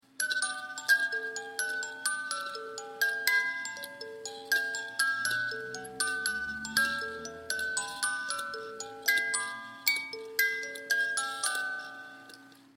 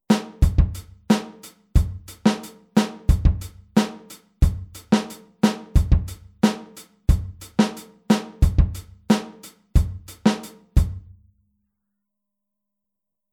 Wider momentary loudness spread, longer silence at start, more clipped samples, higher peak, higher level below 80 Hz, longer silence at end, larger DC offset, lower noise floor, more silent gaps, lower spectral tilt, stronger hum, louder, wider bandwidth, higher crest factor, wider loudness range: about the same, 13 LU vs 15 LU; about the same, 0.2 s vs 0.1 s; neither; second, -10 dBFS vs -4 dBFS; second, -70 dBFS vs -26 dBFS; second, 0.15 s vs 2.35 s; neither; second, -53 dBFS vs -85 dBFS; neither; second, 0.5 dB/octave vs -6.5 dB/octave; neither; second, -31 LUFS vs -23 LUFS; about the same, 16.5 kHz vs 16 kHz; first, 24 dB vs 18 dB; about the same, 2 LU vs 4 LU